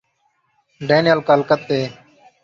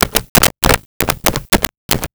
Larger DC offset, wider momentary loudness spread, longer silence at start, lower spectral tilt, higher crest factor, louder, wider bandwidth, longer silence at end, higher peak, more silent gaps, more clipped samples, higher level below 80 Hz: neither; first, 12 LU vs 7 LU; first, 0.8 s vs 0 s; first, -6.5 dB/octave vs -2.5 dB/octave; about the same, 18 dB vs 16 dB; second, -17 LUFS vs -14 LUFS; second, 7.4 kHz vs over 20 kHz; first, 0.5 s vs 0.05 s; about the same, -2 dBFS vs 0 dBFS; second, none vs 0.29-0.35 s, 0.86-1.00 s, 1.77-1.89 s; neither; second, -60 dBFS vs -28 dBFS